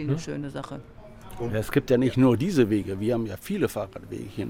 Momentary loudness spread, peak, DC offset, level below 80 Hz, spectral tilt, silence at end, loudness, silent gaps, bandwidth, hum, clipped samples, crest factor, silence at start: 16 LU; -8 dBFS; under 0.1%; -50 dBFS; -7 dB/octave; 0 s; -25 LUFS; none; 17 kHz; none; under 0.1%; 18 dB; 0 s